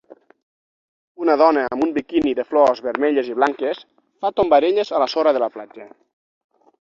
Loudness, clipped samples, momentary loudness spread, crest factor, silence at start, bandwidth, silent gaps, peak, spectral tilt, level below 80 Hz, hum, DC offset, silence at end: -19 LUFS; under 0.1%; 10 LU; 18 dB; 1.2 s; 7.4 kHz; none; -2 dBFS; -5.5 dB/octave; -60 dBFS; none; under 0.1%; 1.05 s